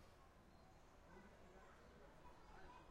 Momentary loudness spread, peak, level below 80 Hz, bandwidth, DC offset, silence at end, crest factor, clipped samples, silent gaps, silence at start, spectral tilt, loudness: 5 LU; -48 dBFS; -70 dBFS; 16 kHz; under 0.1%; 0 s; 16 dB; under 0.1%; none; 0 s; -5 dB/octave; -66 LUFS